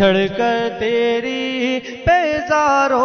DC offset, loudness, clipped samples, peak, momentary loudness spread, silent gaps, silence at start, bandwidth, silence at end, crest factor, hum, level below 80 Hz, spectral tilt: under 0.1%; -17 LUFS; under 0.1%; -4 dBFS; 6 LU; none; 0 s; 6.8 kHz; 0 s; 14 dB; none; -42 dBFS; -5 dB/octave